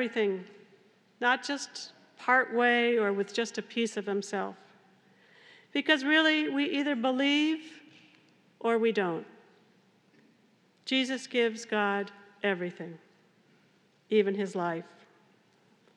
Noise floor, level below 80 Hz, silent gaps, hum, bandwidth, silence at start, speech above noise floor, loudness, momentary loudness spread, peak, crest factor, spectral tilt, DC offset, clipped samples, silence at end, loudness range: -66 dBFS; under -90 dBFS; none; none; 11 kHz; 0 s; 37 dB; -29 LUFS; 15 LU; -8 dBFS; 22 dB; -4 dB/octave; under 0.1%; under 0.1%; 1.1 s; 6 LU